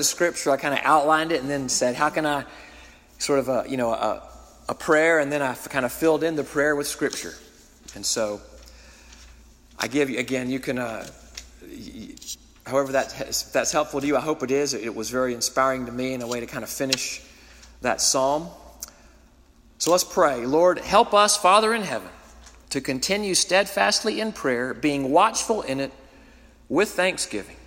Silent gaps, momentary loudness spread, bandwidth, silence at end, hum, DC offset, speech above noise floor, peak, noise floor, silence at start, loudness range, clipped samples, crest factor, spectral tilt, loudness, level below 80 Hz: none; 18 LU; 16.5 kHz; 0.05 s; none; under 0.1%; 31 dB; -4 dBFS; -54 dBFS; 0 s; 9 LU; under 0.1%; 22 dB; -2.5 dB/octave; -23 LUFS; -52 dBFS